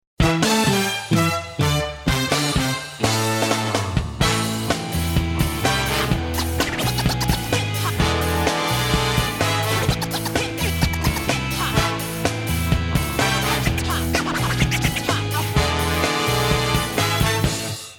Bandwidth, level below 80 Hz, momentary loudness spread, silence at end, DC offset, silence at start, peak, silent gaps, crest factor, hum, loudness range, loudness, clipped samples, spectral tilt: 19.5 kHz; -32 dBFS; 4 LU; 0 s; under 0.1%; 0.2 s; -6 dBFS; none; 14 dB; none; 1 LU; -21 LUFS; under 0.1%; -4 dB/octave